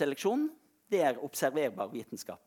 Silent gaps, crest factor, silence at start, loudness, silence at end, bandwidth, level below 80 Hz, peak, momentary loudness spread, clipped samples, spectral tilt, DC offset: none; 18 dB; 0 s; -33 LUFS; 0.1 s; 19 kHz; -84 dBFS; -14 dBFS; 9 LU; under 0.1%; -4.5 dB/octave; under 0.1%